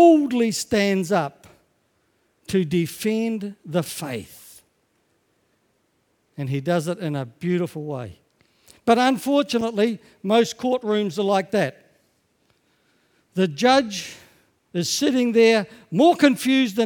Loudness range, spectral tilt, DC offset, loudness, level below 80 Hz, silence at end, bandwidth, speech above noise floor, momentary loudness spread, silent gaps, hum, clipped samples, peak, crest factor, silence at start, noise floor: 9 LU; -5 dB/octave; under 0.1%; -22 LUFS; -62 dBFS; 0 s; 19 kHz; 47 dB; 14 LU; none; none; under 0.1%; 0 dBFS; 22 dB; 0 s; -68 dBFS